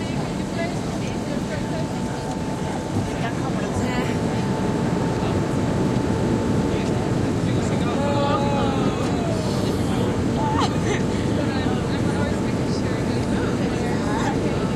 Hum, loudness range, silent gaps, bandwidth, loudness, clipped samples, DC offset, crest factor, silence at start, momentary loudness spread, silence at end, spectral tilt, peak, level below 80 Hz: none; 3 LU; none; 14.5 kHz; -23 LUFS; under 0.1%; under 0.1%; 14 dB; 0 s; 5 LU; 0 s; -6.5 dB/octave; -8 dBFS; -38 dBFS